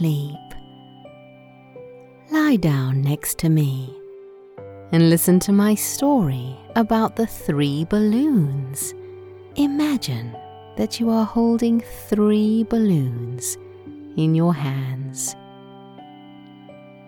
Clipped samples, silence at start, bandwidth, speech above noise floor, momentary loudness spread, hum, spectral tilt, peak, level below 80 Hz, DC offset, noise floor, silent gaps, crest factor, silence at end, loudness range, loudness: under 0.1%; 0 s; 19 kHz; 27 dB; 21 LU; none; -6 dB/octave; -4 dBFS; -50 dBFS; under 0.1%; -46 dBFS; none; 16 dB; 0.15 s; 5 LU; -20 LUFS